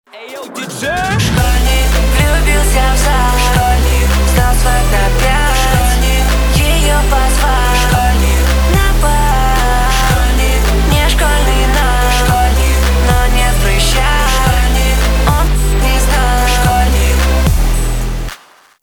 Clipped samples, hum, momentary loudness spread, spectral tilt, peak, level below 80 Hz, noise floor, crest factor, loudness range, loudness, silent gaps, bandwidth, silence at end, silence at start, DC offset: under 0.1%; none; 2 LU; -4 dB/octave; -2 dBFS; -12 dBFS; -37 dBFS; 8 dB; 1 LU; -12 LUFS; none; 20 kHz; 0.45 s; 0.15 s; under 0.1%